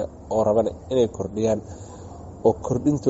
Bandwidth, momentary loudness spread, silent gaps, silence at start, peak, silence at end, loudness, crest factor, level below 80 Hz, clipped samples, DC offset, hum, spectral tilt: 8 kHz; 18 LU; none; 0 s; -6 dBFS; 0 s; -23 LUFS; 18 dB; -46 dBFS; under 0.1%; under 0.1%; none; -8 dB/octave